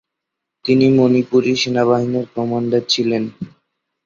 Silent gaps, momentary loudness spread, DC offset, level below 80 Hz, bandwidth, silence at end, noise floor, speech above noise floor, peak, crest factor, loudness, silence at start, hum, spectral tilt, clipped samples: none; 14 LU; under 0.1%; -58 dBFS; 7.6 kHz; 0.6 s; -80 dBFS; 64 dB; -2 dBFS; 14 dB; -16 LUFS; 0.65 s; none; -5.5 dB/octave; under 0.1%